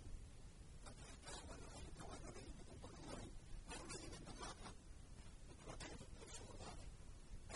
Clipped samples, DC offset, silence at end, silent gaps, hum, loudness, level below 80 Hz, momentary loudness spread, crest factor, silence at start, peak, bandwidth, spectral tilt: under 0.1%; under 0.1%; 0 s; none; none; -57 LUFS; -58 dBFS; 8 LU; 16 dB; 0 s; -40 dBFS; 11.5 kHz; -4 dB/octave